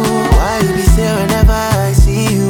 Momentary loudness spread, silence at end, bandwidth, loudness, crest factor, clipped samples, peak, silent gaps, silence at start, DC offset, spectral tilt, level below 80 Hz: 2 LU; 0 s; 19.5 kHz; -12 LUFS; 10 dB; under 0.1%; 0 dBFS; none; 0 s; under 0.1%; -5.5 dB/octave; -14 dBFS